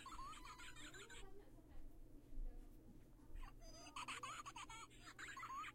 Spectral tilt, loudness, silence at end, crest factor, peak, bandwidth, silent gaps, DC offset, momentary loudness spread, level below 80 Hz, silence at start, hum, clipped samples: -2.5 dB/octave; -56 LUFS; 0 s; 16 dB; -38 dBFS; 16 kHz; none; under 0.1%; 15 LU; -58 dBFS; 0 s; none; under 0.1%